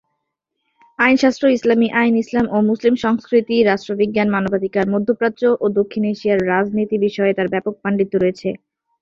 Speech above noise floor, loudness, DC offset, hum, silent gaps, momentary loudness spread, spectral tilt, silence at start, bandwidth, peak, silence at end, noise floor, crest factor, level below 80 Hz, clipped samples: 59 dB; -17 LUFS; under 0.1%; none; none; 5 LU; -6.5 dB/octave; 1 s; 7.4 kHz; 0 dBFS; 0.45 s; -76 dBFS; 16 dB; -54 dBFS; under 0.1%